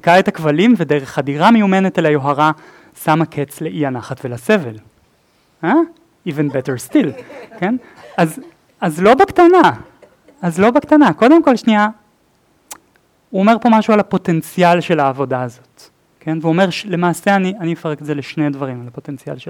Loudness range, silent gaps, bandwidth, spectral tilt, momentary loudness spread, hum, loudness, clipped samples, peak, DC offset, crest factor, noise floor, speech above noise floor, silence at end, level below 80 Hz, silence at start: 7 LU; none; 17 kHz; -6.5 dB/octave; 15 LU; none; -15 LUFS; under 0.1%; 0 dBFS; under 0.1%; 14 dB; -57 dBFS; 42 dB; 0 s; -56 dBFS; 0.05 s